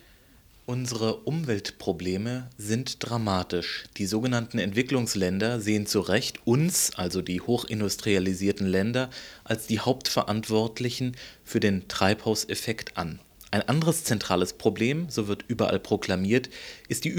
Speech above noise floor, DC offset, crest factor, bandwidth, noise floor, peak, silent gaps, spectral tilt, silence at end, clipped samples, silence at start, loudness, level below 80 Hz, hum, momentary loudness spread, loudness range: 29 dB; under 0.1%; 22 dB; over 20 kHz; -56 dBFS; -6 dBFS; none; -4.5 dB/octave; 0 s; under 0.1%; 0.7 s; -27 LUFS; -56 dBFS; none; 8 LU; 4 LU